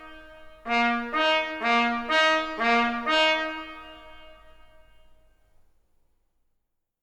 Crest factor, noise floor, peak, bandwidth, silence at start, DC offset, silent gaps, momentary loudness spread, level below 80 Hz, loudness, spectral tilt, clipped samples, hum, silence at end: 18 dB; -76 dBFS; -10 dBFS; 10.5 kHz; 0 s; under 0.1%; none; 20 LU; -56 dBFS; -23 LUFS; -2.5 dB/octave; under 0.1%; none; 2.5 s